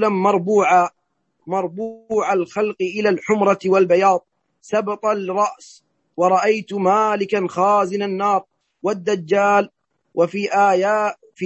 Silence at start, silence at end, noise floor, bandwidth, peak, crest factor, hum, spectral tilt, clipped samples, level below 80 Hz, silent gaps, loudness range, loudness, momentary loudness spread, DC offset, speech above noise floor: 0 s; 0 s; -67 dBFS; 8.4 kHz; -2 dBFS; 16 dB; none; -5.5 dB/octave; under 0.1%; -68 dBFS; none; 1 LU; -19 LUFS; 9 LU; under 0.1%; 49 dB